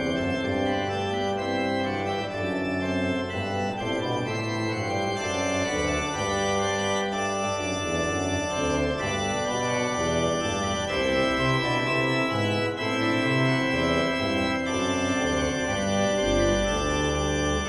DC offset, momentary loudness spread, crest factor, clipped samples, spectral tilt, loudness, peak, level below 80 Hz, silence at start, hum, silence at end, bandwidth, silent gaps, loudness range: under 0.1%; 4 LU; 14 dB; under 0.1%; -4.5 dB/octave; -26 LUFS; -12 dBFS; -42 dBFS; 0 s; none; 0 s; 14 kHz; none; 3 LU